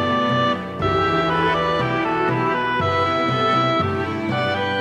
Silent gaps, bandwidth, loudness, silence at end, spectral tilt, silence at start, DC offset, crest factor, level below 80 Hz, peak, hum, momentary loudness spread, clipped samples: none; 11 kHz; -20 LUFS; 0 s; -6.5 dB/octave; 0 s; under 0.1%; 12 dB; -46 dBFS; -8 dBFS; none; 4 LU; under 0.1%